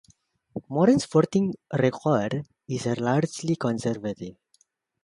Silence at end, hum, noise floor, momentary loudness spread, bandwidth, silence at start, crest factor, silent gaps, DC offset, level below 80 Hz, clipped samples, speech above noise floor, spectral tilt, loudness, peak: 0.7 s; none; -67 dBFS; 13 LU; 11.5 kHz; 0.55 s; 18 dB; none; under 0.1%; -62 dBFS; under 0.1%; 42 dB; -6.5 dB/octave; -25 LUFS; -6 dBFS